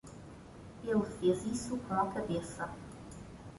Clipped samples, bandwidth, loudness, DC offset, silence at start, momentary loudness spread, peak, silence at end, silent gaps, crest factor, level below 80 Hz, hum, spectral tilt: under 0.1%; 11.5 kHz; -35 LUFS; under 0.1%; 0.05 s; 19 LU; -16 dBFS; 0 s; none; 20 dB; -58 dBFS; none; -6 dB/octave